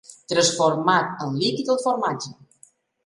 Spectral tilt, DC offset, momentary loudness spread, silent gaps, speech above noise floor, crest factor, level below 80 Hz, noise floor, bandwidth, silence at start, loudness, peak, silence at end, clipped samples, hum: -3.5 dB/octave; under 0.1%; 8 LU; none; 35 dB; 18 dB; -66 dBFS; -56 dBFS; 11.5 kHz; 0.1 s; -22 LUFS; -4 dBFS; 0.75 s; under 0.1%; none